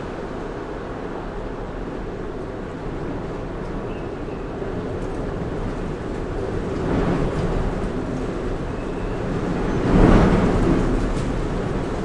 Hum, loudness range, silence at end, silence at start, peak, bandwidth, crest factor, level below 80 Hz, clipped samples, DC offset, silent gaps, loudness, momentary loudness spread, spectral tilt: none; 10 LU; 0 s; 0 s; 0 dBFS; 10.5 kHz; 22 dB; -28 dBFS; under 0.1%; under 0.1%; none; -24 LUFS; 12 LU; -7.5 dB/octave